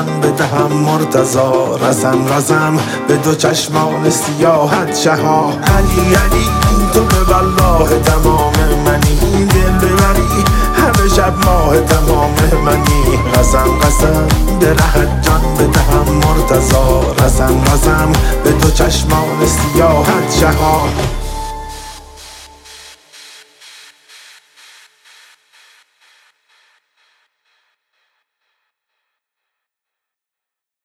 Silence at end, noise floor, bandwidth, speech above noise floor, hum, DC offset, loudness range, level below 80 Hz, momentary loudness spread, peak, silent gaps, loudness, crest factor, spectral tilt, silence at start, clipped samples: 7.95 s; -85 dBFS; 17 kHz; 74 dB; none; under 0.1%; 3 LU; -18 dBFS; 3 LU; 0 dBFS; none; -12 LUFS; 12 dB; -5 dB/octave; 0 s; under 0.1%